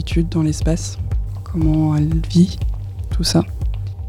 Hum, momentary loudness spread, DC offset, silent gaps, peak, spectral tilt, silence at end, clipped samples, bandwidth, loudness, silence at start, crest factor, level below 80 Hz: none; 9 LU; under 0.1%; none; -2 dBFS; -6.5 dB/octave; 0 s; under 0.1%; 14.5 kHz; -19 LUFS; 0 s; 16 dB; -24 dBFS